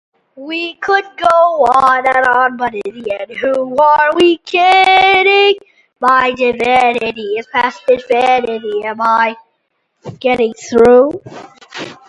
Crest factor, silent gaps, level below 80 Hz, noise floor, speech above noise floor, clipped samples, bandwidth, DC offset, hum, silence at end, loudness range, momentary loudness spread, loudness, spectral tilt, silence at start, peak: 12 dB; none; -50 dBFS; -66 dBFS; 54 dB; under 0.1%; 11 kHz; under 0.1%; none; 0.15 s; 5 LU; 13 LU; -12 LUFS; -4 dB/octave; 0.35 s; 0 dBFS